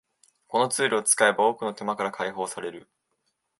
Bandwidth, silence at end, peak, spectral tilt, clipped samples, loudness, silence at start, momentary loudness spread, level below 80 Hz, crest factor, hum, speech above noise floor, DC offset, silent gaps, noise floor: 12 kHz; 0.8 s; -4 dBFS; -2 dB/octave; under 0.1%; -24 LUFS; 0.5 s; 12 LU; -76 dBFS; 24 dB; none; 51 dB; under 0.1%; none; -76 dBFS